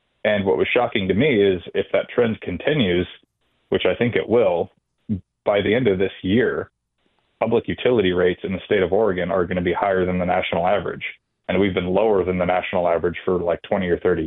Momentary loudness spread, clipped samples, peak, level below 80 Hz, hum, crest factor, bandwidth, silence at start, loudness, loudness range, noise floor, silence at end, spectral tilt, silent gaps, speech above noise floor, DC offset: 7 LU; under 0.1%; -4 dBFS; -50 dBFS; none; 16 dB; 4.1 kHz; 0.25 s; -21 LUFS; 2 LU; -68 dBFS; 0 s; -10 dB/octave; none; 49 dB; under 0.1%